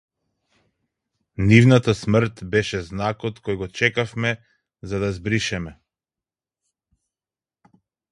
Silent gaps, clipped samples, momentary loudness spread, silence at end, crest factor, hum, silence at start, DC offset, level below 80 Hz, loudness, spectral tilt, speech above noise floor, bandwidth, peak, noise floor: none; under 0.1%; 16 LU; 2.4 s; 22 dB; none; 1.4 s; under 0.1%; -46 dBFS; -21 LUFS; -6 dB/octave; over 70 dB; 11 kHz; 0 dBFS; under -90 dBFS